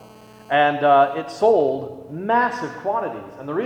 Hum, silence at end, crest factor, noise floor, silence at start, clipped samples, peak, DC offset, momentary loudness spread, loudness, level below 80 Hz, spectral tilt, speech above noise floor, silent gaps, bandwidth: 60 Hz at -55 dBFS; 0 s; 16 dB; -45 dBFS; 0 s; under 0.1%; -4 dBFS; under 0.1%; 15 LU; -20 LUFS; -64 dBFS; -6 dB/octave; 25 dB; none; 9.4 kHz